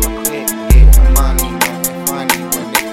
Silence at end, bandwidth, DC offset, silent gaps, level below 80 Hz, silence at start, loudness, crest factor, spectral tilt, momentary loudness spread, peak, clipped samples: 0 s; 16.5 kHz; under 0.1%; none; -12 dBFS; 0 s; -13 LUFS; 10 dB; -4 dB/octave; 8 LU; 0 dBFS; under 0.1%